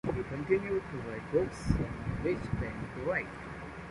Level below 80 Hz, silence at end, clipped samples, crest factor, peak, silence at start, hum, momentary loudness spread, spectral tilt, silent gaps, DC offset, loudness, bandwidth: -46 dBFS; 0 s; under 0.1%; 22 dB; -12 dBFS; 0.05 s; none; 10 LU; -7.5 dB/octave; none; under 0.1%; -35 LUFS; 11.5 kHz